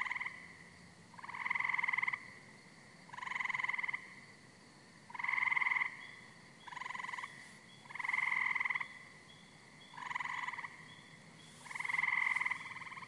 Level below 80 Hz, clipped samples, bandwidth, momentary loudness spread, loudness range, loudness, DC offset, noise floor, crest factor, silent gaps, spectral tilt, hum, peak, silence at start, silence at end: -84 dBFS; under 0.1%; 11.5 kHz; 24 LU; 4 LU; -37 LUFS; under 0.1%; -60 dBFS; 20 dB; none; -2 dB/octave; none; -20 dBFS; 0 s; 0 s